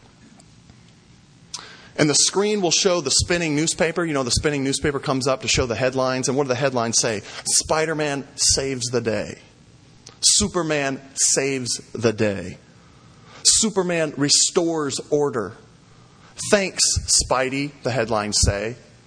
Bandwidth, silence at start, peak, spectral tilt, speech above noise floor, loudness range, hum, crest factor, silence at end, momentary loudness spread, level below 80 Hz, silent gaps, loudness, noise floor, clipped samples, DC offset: 10.5 kHz; 1.55 s; 0 dBFS; -2.5 dB/octave; 29 dB; 2 LU; none; 22 dB; 0.3 s; 10 LU; -40 dBFS; none; -20 LUFS; -51 dBFS; under 0.1%; under 0.1%